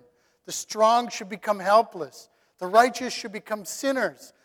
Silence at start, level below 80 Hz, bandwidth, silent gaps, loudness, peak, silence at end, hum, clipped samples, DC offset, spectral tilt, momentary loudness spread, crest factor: 0.5 s; -72 dBFS; 18 kHz; none; -24 LUFS; -4 dBFS; 0.15 s; none; under 0.1%; under 0.1%; -2.5 dB/octave; 14 LU; 22 dB